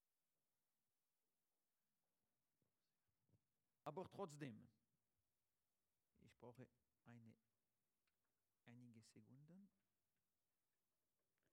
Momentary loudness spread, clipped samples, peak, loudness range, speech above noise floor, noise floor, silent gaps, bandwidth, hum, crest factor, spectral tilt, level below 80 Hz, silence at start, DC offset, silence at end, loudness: 14 LU; under 0.1%; -38 dBFS; 4 LU; over 30 dB; under -90 dBFS; none; 9.6 kHz; none; 28 dB; -6 dB/octave; under -90 dBFS; 3.3 s; under 0.1%; 1.85 s; -60 LUFS